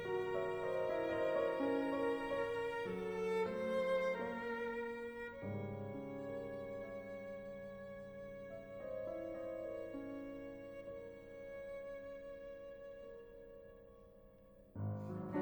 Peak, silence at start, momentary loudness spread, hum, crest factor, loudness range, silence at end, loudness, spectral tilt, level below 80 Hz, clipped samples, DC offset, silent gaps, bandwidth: -26 dBFS; 0 s; 15 LU; none; 16 dB; 13 LU; 0 s; -43 LUFS; -7 dB/octave; -68 dBFS; under 0.1%; under 0.1%; none; over 20 kHz